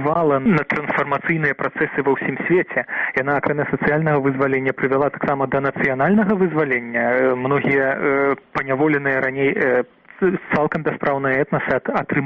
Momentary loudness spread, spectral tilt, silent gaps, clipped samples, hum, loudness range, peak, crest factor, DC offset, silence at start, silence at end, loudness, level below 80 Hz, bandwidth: 4 LU; -9 dB/octave; none; under 0.1%; none; 1 LU; -4 dBFS; 14 dB; under 0.1%; 0 s; 0 s; -19 LUFS; -54 dBFS; 6.2 kHz